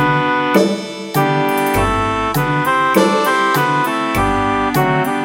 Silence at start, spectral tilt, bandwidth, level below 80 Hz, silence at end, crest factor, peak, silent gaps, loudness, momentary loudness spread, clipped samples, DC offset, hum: 0 s; -5.5 dB/octave; 16.5 kHz; -34 dBFS; 0 s; 14 dB; 0 dBFS; none; -15 LUFS; 4 LU; under 0.1%; under 0.1%; none